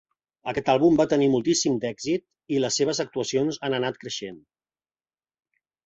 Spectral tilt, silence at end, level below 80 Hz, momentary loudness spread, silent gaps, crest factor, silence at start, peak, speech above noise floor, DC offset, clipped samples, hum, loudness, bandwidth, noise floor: -4.5 dB/octave; 1.5 s; -62 dBFS; 13 LU; none; 18 dB; 0.45 s; -8 dBFS; over 66 dB; under 0.1%; under 0.1%; none; -24 LUFS; 8.2 kHz; under -90 dBFS